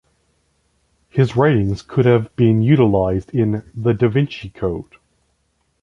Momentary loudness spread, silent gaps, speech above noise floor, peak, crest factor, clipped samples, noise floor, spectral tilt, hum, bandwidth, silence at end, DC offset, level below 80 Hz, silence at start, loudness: 11 LU; none; 50 dB; -2 dBFS; 16 dB; under 0.1%; -66 dBFS; -9 dB/octave; none; 7.4 kHz; 1 s; under 0.1%; -42 dBFS; 1.15 s; -17 LUFS